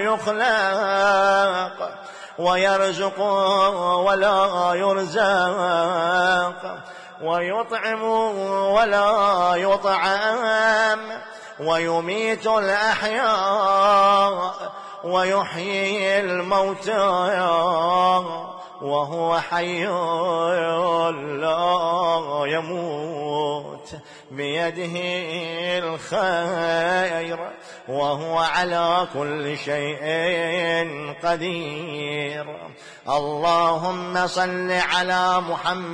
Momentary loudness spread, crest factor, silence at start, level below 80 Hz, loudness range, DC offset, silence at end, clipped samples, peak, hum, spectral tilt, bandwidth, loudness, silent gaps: 12 LU; 14 dB; 0 s; -60 dBFS; 5 LU; under 0.1%; 0 s; under 0.1%; -8 dBFS; none; -4 dB/octave; 10.5 kHz; -21 LUFS; none